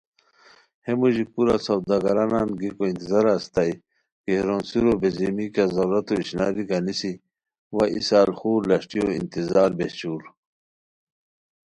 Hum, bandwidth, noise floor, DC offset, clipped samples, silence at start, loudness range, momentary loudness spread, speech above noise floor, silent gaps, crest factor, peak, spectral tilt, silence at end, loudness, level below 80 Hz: none; 11 kHz; -55 dBFS; under 0.1%; under 0.1%; 0.85 s; 2 LU; 8 LU; 33 dB; 4.12-4.24 s, 7.59-7.70 s; 18 dB; -6 dBFS; -6.5 dB/octave; 1.5 s; -23 LUFS; -54 dBFS